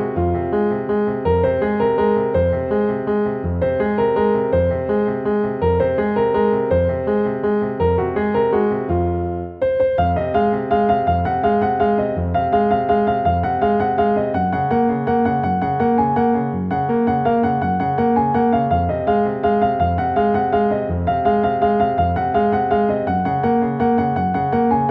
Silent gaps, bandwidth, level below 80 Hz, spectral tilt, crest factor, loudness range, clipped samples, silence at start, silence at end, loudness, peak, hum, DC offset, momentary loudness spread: none; 5.2 kHz; -38 dBFS; -10.5 dB/octave; 14 dB; 1 LU; under 0.1%; 0 s; 0 s; -18 LUFS; -4 dBFS; none; under 0.1%; 3 LU